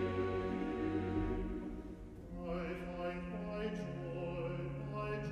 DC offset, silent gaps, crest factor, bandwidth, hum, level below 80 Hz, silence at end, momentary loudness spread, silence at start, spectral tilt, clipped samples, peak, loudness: under 0.1%; none; 14 dB; 11.5 kHz; none; -52 dBFS; 0 s; 9 LU; 0 s; -8 dB/octave; under 0.1%; -26 dBFS; -41 LUFS